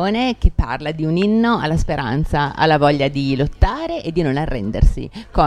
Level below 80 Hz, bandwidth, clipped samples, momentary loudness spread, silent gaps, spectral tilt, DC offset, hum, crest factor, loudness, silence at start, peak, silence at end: -22 dBFS; 10.5 kHz; under 0.1%; 7 LU; none; -7 dB/octave; under 0.1%; none; 16 dB; -18 LUFS; 0 s; 0 dBFS; 0 s